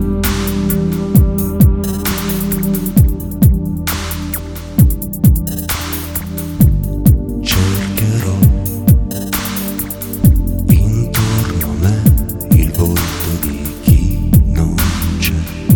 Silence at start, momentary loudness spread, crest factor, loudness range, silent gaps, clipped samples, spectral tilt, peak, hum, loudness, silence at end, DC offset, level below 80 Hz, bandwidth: 0 s; 7 LU; 12 dB; 2 LU; none; under 0.1%; -6 dB/octave; 0 dBFS; none; -14 LUFS; 0 s; under 0.1%; -18 dBFS; 19 kHz